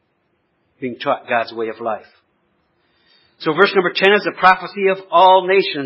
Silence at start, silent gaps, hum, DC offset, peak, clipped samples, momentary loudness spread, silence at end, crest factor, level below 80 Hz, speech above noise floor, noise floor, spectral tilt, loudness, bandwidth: 0.8 s; none; none; under 0.1%; 0 dBFS; under 0.1%; 14 LU; 0 s; 18 dB; -64 dBFS; 50 dB; -66 dBFS; -6.5 dB/octave; -15 LUFS; 5.8 kHz